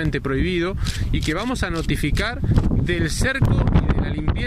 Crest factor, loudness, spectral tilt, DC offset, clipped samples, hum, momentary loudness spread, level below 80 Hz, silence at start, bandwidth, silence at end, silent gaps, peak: 14 dB; -21 LUFS; -6 dB/octave; under 0.1%; under 0.1%; none; 5 LU; -26 dBFS; 0 s; 15.5 kHz; 0 s; none; -6 dBFS